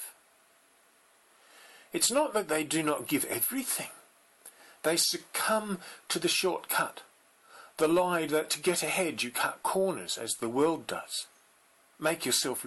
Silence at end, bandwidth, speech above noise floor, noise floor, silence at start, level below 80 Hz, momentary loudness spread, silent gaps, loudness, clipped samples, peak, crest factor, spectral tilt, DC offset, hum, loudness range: 0 s; 16 kHz; 34 dB; -64 dBFS; 0 s; -74 dBFS; 10 LU; none; -30 LUFS; under 0.1%; -16 dBFS; 16 dB; -2.5 dB/octave; under 0.1%; none; 2 LU